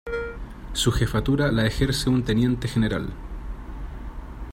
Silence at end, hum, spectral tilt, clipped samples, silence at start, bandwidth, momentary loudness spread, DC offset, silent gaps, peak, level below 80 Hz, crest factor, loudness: 0 s; none; -5.5 dB/octave; under 0.1%; 0.05 s; 16 kHz; 16 LU; under 0.1%; none; -8 dBFS; -34 dBFS; 16 dB; -24 LUFS